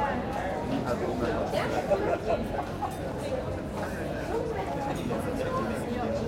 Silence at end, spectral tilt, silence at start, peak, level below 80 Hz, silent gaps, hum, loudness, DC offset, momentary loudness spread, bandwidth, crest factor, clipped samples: 0 s; -6.5 dB/octave; 0 s; -14 dBFS; -44 dBFS; none; none; -31 LUFS; under 0.1%; 6 LU; 16.5 kHz; 16 dB; under 0.1%